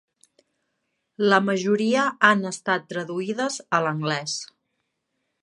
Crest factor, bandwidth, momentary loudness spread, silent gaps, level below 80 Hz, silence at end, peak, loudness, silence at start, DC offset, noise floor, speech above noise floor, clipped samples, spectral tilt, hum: 24 dB; 11.5 kHz; 11 LU; none; -76 dBFS; 0.95 s; -2 dBFS; -23 LUFS; 1.2 s; under 0.1%; -77 dBFS; 54 dB; under 0.1%; -4.5 dB/octave; none